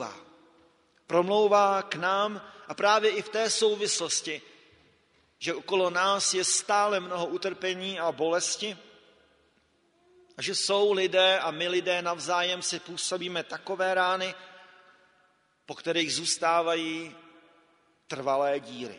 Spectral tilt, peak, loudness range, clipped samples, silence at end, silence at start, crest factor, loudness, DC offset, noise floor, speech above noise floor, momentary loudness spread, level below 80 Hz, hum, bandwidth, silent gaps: -2 dB/octave; -8 dBFS; 5 LU; under 0.1%; 0 s; 0 s; 20 dB; -27 LUFS; under 0.1%; -68 dBFS; 40 dB; 12 LU; -78 dBFS; none; 10.5 kHz; none